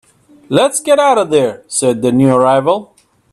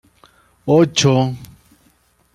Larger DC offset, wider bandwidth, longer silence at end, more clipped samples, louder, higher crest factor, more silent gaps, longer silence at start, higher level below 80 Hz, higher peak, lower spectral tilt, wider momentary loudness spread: neither; about the same, 14 kHz vs 14.5 kHz; second, 0.5 s vs 0.9 s; neither; first, -12 LUFS vs -15 LUFS; about the same, 12 dB vs 16 dB; neither; second, 0.5 s vs 0.65 s; about the same, -56 dBFS vs -52 dBFS; about the same, 0 dBFS vs -2 dBFS; about the same, -5 dB/octave vs -5.5 dB/octave; second, 6 LU vs 18 LU